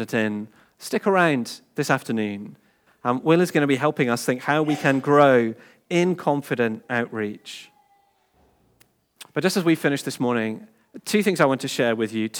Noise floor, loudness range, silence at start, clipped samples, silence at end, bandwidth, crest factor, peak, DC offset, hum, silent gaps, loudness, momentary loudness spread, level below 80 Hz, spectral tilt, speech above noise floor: -63 dBFS; 7 LU; 0 s; under 0.1%; 0 s; over 20 kHz; 20 dB; -4 dBFS; under 0.1%; none; none; -22 LUFS; 14 LU; -76 dBFS; -5.5 dB/octave; 41 dB